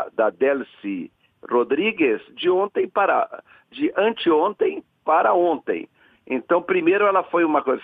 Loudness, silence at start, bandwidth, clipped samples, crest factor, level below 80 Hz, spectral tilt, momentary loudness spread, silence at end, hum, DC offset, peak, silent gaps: -21 LUFS; 0 s; 4.6 kHz; under 0.1%; 16 dB; -68 dBFS; -8.5 dB/octave; 12 LU; 0 s; none; under 0.1%; -6 dBFS; none